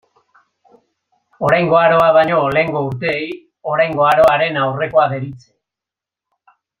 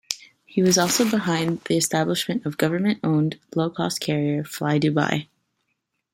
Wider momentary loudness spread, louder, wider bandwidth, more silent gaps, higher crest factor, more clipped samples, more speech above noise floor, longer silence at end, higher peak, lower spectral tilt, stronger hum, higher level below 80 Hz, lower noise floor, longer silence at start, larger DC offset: first, 11 LU vs 7 LU; first, -14 LUFS vs -23 LUFS; second, 13 kHz vs 16.5 kHz; neither; second, 14 dB vs 22 dB; neither; first, 72 dB vs 54 dB; first, 1.45 s vs 0.9 s; about the same, -2 dBFS vs -2 dBFS; first, -6.5 dB/octave vs -4.5 dB/octave; neither; first, -52 dBFS vs -64 dBFS; first, -87 dBFS vs -76 dBFS; first, 1.4 s vs 0.1 s; neither